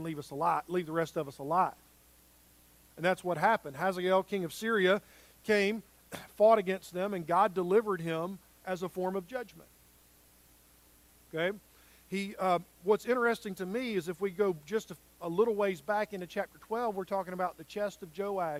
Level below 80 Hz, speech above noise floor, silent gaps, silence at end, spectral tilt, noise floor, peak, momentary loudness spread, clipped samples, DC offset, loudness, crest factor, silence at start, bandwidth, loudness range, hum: -68 dBFS; 30 dB; none; 0 s; -5.5 dB/octave; -62 dBFS; -12 dBFS; 12 LU; under 0.1%; under 0.1%; -32 LUFS; 20 dB; 0 s; 16 kHz; 9 LU; none